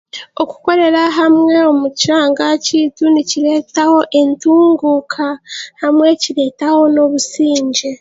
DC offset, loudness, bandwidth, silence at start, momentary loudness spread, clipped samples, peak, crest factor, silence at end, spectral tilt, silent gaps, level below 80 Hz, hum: under 0.1%; -12 LUFS; 8 kHz; 0.15 s; 9 LU; under 0.1%; 0 dBFS; 12 dB; 0.05 s; -3 dB/octave; none; -62 dBFS; none